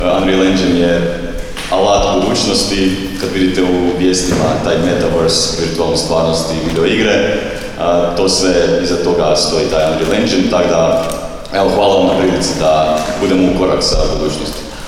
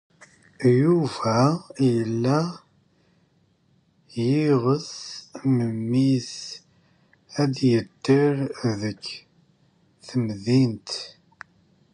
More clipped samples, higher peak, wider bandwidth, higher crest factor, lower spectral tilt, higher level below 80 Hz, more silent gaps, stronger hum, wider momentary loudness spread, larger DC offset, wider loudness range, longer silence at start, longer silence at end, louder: neither; first, 0 dBFS vs -6 dBFS; first, 15.5 kHz vs 11 kHz; second, 12 dB vs 18 dB; second, -4.5 dB/octave vs -7 dB/octave; first, -28 dBFS vs -62 dBFS; neither; neither; second, 7 LU vs 15 LU; neither; second, 1 LU vs 4 LU; second, 0 s vs 0.6 s; second, 0 s vs 0.85 s; first, -13 LUFS vs -23 LUFS